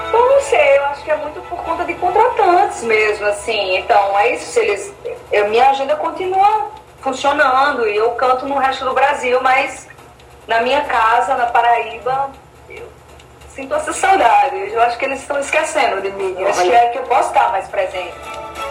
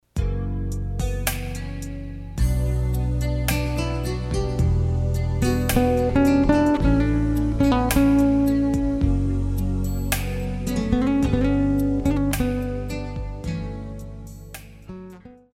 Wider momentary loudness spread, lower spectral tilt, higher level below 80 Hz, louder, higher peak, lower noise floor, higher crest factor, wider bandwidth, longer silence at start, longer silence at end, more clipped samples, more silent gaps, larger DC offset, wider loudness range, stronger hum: about the same, 13 LU vs 15 LU; second, -2.5 dB/octave vs -6.5 dB/octave; second, -48 dBFS vs -28 dBFS; first, -15 LUFS vs -23 LUFS; first, 0 dBFS vs -6 dBFS; about the same, -41 dBFS vs -43 dBFS; about the same, 16 dB vs 16 dB; about the same, 16 kHz vs 16.5 kHz; second, 0 s vs 0.15 s; second, 0 s vs 0.2 s; neither; neither; neither; second, 2 LU vs 7 LU; neither